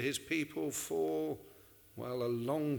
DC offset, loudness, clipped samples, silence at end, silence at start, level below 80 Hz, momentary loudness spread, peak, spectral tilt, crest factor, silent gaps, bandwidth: under 0.1%; -37 LUFS; under 0.1%; 0 s; 0 s; -72 dBFS; 12 LU; -22 dBFS; -4.5 dB/octave; 14 dB; none; over 20 kHz